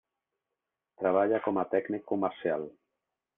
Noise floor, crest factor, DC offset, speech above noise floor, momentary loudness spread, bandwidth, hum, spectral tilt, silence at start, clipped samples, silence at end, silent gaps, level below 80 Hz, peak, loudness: -88 dBFS; 20 dB; under 0.1%; 58 dB; 7 LU; 3.8 kHz; none; -5.5 dB/octave; 1 s; under 0.1%; 0.65 s; none; -76 dBFS; -12 dBFS; -30 LUFS